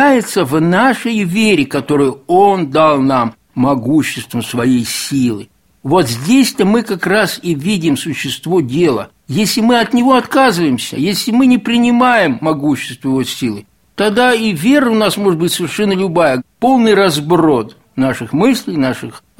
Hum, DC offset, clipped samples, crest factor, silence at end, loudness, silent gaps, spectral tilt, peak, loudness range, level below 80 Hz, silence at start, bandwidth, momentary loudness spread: none; 0.2%; under 0.1%; 12 dB; 0.2 s; -13 LUFS; none; -5 dB/octave; 0 dBFS; 2 LU; -50 dBFS; 0 s; 16.5 kHz; 7 LU